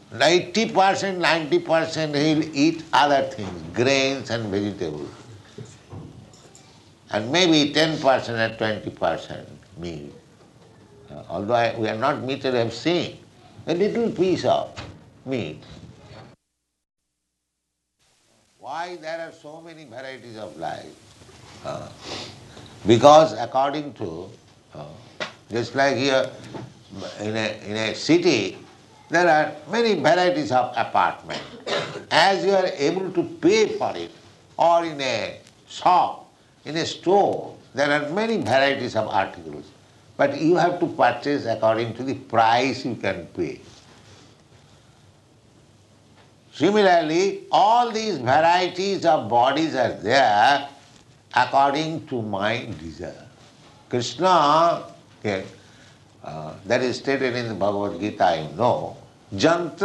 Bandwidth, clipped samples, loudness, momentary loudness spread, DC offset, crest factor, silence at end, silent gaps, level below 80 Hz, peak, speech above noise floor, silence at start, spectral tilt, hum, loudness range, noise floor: 11.5 kHz; under 0.1%; -21 LUFS; 20 LU; under 0.1%; 22 dB; 0 s; none; -62 dBFS; 0 dBFS; 57 dB; 0.1 s; -4.5 dB/octave; none; 14 LU; -78 dBFS